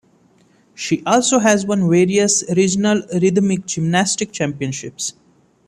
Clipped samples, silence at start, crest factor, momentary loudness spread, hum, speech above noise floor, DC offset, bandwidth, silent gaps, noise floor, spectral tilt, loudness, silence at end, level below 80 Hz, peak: under 0.1%; 0.8 s; 16 dB; 11 LU; none; 38 dB; under 0.1%; 13 kHz; none; -54 dBFS; -4.5 dB/octave; -17 LUFS; 0.55 s; -56 dBFS; -2 dBFS